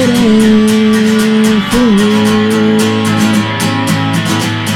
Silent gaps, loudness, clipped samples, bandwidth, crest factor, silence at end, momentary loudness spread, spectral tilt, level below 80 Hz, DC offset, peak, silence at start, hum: none; -10 LUFS; under 0.1%; 16 kHz; 8 dB; 0 s; 5 LU; -5 dB/octave; -36 dBFS; under 0.1%; 0 dBFS; 0 s; none